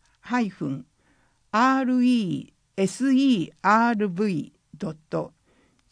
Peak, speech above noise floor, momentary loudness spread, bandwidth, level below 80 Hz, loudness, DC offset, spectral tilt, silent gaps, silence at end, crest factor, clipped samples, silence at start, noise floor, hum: -6 dBFS; 41 dB; 15 LU; 10.5 kHz; -68 dBFS; -24 LUFS; under 0.1%; -6 dB/octave; none; 0.65 s; 18 dB; under 0.1%; 0.25 s; -64 dBFS; none